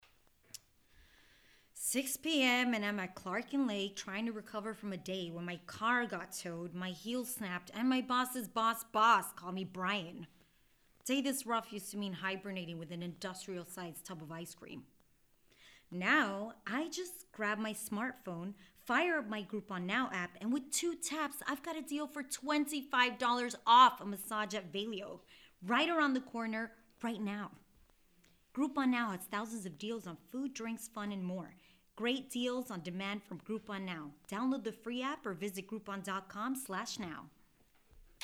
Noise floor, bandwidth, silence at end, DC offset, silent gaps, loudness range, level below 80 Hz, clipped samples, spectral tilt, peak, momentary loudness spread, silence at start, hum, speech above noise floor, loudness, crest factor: -70 dBFS; 19 kHz; 0.2 s; under 0.1%; none; 9 LU; -74 dBFS; under 0.1%; -3.5 dB/octave; -14 dBFS; 15 LU; 0.55 s; none; 33 dB; -37 LUFS; 24 dB